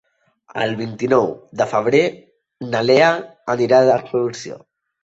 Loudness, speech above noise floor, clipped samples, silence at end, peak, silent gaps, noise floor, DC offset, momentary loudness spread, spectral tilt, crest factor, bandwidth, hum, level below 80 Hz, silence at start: -18 LUFS; 34 dB; under 0.1%; 0.45 s; -2 dBFS; none; -52 dBFS; under 0.1%; 18 LU; -5.5 dB/octave; 18 dB; 8 kHz; none; -60 dBFS; 0.55 s